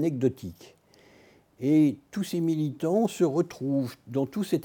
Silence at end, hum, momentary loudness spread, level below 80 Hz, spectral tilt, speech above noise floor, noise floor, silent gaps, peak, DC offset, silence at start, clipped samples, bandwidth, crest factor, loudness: 0 s; none; 9 LU; -70 dBFS; -7.5 dB/octave; 31 dB; -58 dBFS; none; -12 dBFS; under 0.1%; 0 s; under 0.1%; 18 kHz; 16 dB; -27 LUFS